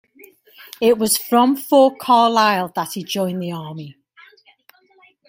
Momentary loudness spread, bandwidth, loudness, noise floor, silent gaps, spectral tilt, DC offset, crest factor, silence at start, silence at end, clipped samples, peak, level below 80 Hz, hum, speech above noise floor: 15 LU; 16.5 kHz; -17 LUFS; -54 dBFS; none; -4 dB/octave; under 0.1%; 18 dB; 0.65 s; 1.4 s; under 0.1%; -2 dBFS; -66 dBFS; none; 37 dB